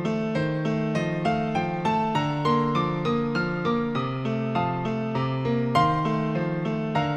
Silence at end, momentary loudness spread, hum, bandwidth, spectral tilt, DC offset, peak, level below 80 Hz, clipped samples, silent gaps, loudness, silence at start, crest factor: 0 s; 4 LU; none; 9 kHz; -7.5 dB/octave; under 0.1%; -8 dBFS; -52 dBFS; under 0.1%; none; -25 LUFS; 0 s; 18 dB